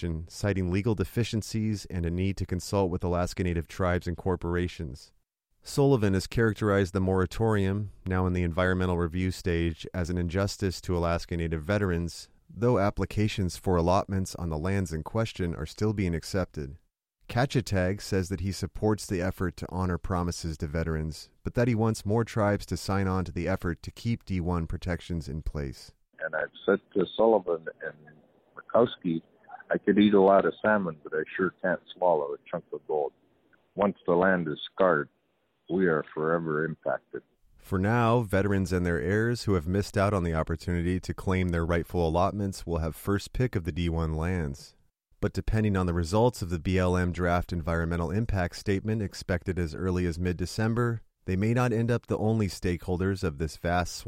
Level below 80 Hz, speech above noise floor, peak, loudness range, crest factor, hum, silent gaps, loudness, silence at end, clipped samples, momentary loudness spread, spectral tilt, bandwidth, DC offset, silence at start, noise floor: -44 dBFS; 46 dB; -10 dBFS; 4 LU; 18 dB; none; none; -28 LUFS; 0 s; under 0.1%; 9 LU; -6.5 dB/octave; 15.5 kHz; under 0.1%; 0 s; -73 dBFS